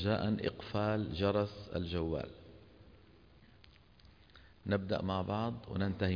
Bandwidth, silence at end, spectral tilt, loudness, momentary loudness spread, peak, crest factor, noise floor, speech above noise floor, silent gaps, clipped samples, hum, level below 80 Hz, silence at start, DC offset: 5.2 kHz; 0 s; -6 dB/octave; -36 LUFS; 9 LU; -20 dBFS; 18 dB; -62 dBFS; 27 dB; none; under 0.1%; none; -56 dBFS; 0 s; under 0.1%